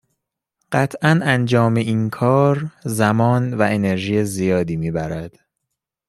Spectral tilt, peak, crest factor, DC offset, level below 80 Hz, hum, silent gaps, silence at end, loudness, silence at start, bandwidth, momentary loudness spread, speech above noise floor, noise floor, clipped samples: -6.5 dB/octave; -2 dBFS; 16 dB; under 0.1%; -52 dBFS; none; none; 0.8 s; -18 LUFS; 0.7 s; 13.5 kHz; 8 LU; 62 dB; -80 dBFS; under 0.1%